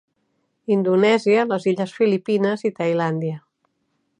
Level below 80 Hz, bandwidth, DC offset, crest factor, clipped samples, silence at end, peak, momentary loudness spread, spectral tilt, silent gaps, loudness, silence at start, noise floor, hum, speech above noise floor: -74 dBFS; 10 kHz; under 0.1%; 16 dB; under 0.1%; 0.8 s; -6 dBFS; 10 LU; -7 dB/octave; none; -20 LUFS; 0.7 s; -71 dBFS; none; 52 dB